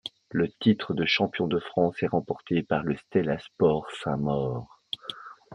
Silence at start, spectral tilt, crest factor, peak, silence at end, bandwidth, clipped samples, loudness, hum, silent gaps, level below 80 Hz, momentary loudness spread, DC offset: 0.05 s; -7 dB/octave; 20 dB; -8 dBFS; 0 s; 10 kHz; under 0.1%; -27 LUFS; none; none; -58 dBFS; 11 LU; under 0.1%